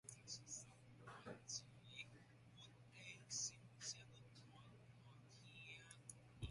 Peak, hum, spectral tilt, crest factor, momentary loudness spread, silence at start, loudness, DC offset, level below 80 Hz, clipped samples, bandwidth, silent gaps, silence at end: -36 dBFS; none; -2 dB/octave; 22 dB; 16 LU; 0.05 s; -55 LUFS; under 0.1%; -74 dBFS; under 0.1%; 11.5 kHz; none; 0 s